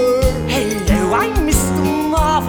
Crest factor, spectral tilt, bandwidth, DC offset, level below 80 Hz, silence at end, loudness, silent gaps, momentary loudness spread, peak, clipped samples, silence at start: 14 dB; -5 dB/octave; over 20 kHz; under 0.1%; -22 dBFS; 0 s; -16 LUFS; none; 2 LU; -2 dBFS; under 0.1%; 0 s